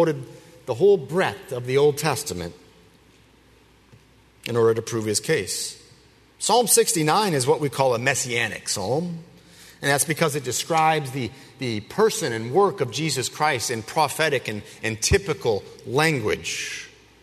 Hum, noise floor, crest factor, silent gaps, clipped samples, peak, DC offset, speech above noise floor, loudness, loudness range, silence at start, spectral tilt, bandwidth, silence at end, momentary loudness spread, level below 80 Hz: none; -55 dBFS; 20 dB; none; under 0.1%; -4 dBFS; under 0.1%; 32 dB; -22 LUFS; 5 LU; 0 s; -3.5 dB/octave; 13.5 kHz; 0.35 s; 12 LU; -48 dBFS